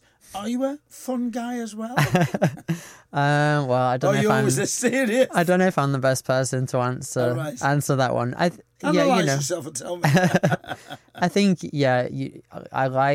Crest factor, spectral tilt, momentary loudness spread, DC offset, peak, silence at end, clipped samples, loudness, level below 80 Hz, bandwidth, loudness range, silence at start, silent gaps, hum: 14 dB; -5.5 dB/octave; 11 LU; under 0.1%; -8 dBFS; 0 s; under 0.1%; -22 LUFS; -60 dBFS; 16.5 kHz; 3 LU; 0.3 s; none; none